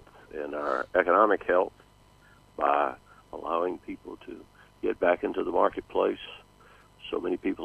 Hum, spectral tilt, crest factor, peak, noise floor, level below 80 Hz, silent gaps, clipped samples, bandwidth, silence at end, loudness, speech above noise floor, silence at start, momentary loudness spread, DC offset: 50 Hz at -65 dBFS; -6 dB/octave; 22 dB; -6 dBFS; -58 dBFS; -60 dBFS; none; under 0.1%; 11.5 kHz; 0 s; -28 LUFS; 30 dB; 0.35 s; 22 LU; under 0.1%